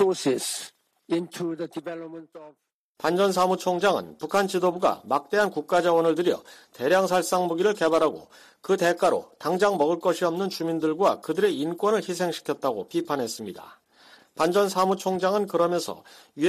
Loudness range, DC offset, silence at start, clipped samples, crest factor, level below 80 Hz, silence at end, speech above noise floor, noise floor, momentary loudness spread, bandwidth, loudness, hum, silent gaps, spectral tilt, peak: 4 LU; under 0.1%; 0 s; under 0.1%; 16 dB; -68 dBFS; 0 s; 30 dB; -55 dBFS; 12 LU; 15 kHz; -25 LUFS; none; 2.73-2.95 s; -4.5 dB/octave; -10 dBFS